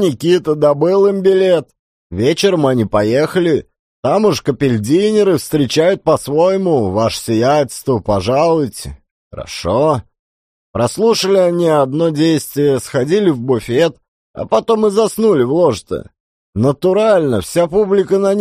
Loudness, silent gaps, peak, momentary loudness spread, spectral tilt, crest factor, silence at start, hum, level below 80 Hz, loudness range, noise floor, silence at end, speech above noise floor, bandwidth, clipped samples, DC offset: -14 LUFS; 1.79-2.10 s, 3.79-4.03 s, 9.11-9.31 s, 10.19-10.74 s, 14.08-14.34 s, 16.20-16.53 s; -2 dBFS; 7 LU; -6 dB/octave; 12 dB; 0 s; none; -44 dBFS; 3 LU; under -90 dBFS; 0 s; over 77 dB; 15.5 kHz; under 0.1%; under 0.1%